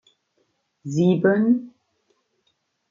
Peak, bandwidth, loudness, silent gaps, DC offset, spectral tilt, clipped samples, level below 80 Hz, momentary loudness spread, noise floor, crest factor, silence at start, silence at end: -6 dBFS; 7.4 kHz; -20 LUFS; none; under 0.1%; -8 dB/octave; under 0.1%; -70 dBFS; 11 LU; -71 dBFS; 18 dB; 0.85 s; 1.2 s